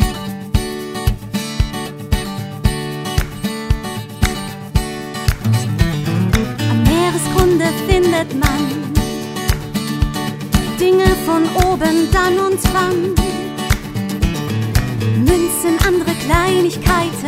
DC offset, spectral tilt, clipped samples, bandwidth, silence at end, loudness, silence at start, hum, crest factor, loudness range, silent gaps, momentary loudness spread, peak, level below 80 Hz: under 0.1%; -5.5 dB/octave; under 0.1%; 16.5 kHz; 0 s; -17 LUFS; 0 s; none; 16 dB; 6 LU; none; 8 LU; 0 dBFS; -24 dBFS